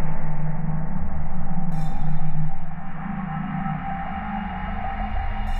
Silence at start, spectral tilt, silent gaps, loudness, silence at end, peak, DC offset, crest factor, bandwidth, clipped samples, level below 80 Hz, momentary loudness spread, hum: 0 s; -8.5 dB/octave; none; -29 LUFS; 0 s; -8 dBFS; under 0.1%; 10 dB; 3 kHz; under 0.1%; -26 dBFS; 3 LU; none